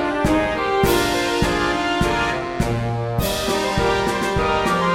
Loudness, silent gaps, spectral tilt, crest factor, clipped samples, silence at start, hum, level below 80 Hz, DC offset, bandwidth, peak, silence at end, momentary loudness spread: -20 LUFS; none; -5 dB/octave; 16 dB; under 0.1%; 0 s; none; -34 dBFS; 0.2%; 16.5 kHz; -4 dBFS; 0 s; 5 LU